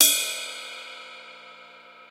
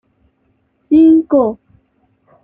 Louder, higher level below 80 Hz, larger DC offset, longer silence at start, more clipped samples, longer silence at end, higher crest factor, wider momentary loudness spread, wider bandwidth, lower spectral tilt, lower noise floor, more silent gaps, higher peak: second, -25 LUFS vs -11 LUFS; second, -82 dBFS vs -52 dBFS; neither; second, 0 s vs 0.9 s; neither; second, 0.05 s vs 0.9 s; first, 28 dB vs 12 dB; first, 23 LU vs 12 LU; first, 16 kHz vs 3.5 kHz; second, 3.5 dB/octave vs -10 dB/octave; second, -48 dBFS vs -61 dBFS; neither; about the same, 0 dBFS vs -2 dBFS